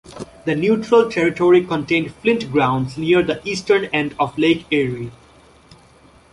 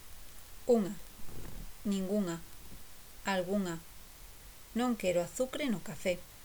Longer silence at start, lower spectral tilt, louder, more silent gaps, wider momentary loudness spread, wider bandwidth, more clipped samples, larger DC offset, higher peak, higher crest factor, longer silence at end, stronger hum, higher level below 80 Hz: about the same, 0.1 s vs 0 s; about the same, -6 dB/octave vs -5 dB/octave; first, -18 LUFS vs -35 LUFS; neither; second, 9 LU vs 21 LU; second, 11.5 kHz vs over 20 kHz; neither; neither; first, -2 dBFS vs -16 dBFS; about the same, 16 dB vs 20 dB; first, 1.2 s vs 0 s; neither; about the same, -52 dBFS vs -54 dBFS